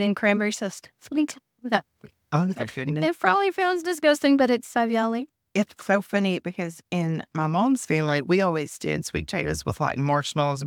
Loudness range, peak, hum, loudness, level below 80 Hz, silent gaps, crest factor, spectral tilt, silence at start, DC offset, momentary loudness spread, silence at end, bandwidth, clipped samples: 3 LU; -4 dBFS; none; -25 LUFS; -54 dBFS; none; 20 dB; -5.5 dB/octave; 0 s; under 0.1%; 8 LU; 0 s; 18 kHz; under 0.1%